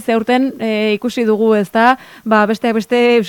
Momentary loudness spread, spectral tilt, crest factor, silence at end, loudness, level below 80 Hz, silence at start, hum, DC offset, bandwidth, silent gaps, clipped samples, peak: 5 LU; -5.5 dB/octave; 14 dB; 0 s; -14 LUFS; -60 dBFS; 0 s; none; under 0.1%; 17.5 kHz; none; under 0.1%; 0 dBFS